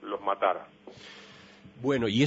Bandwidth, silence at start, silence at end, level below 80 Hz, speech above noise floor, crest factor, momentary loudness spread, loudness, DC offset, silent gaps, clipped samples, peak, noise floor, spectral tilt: 8 kHz; 0 s; 0 s; -64 dBFS; 24 dB; 18 dB; 23 LU; -30 LUFS; under 0.1%; none; under 0.1%; -12 dBFS; -52 dBFS; -6 dB/octave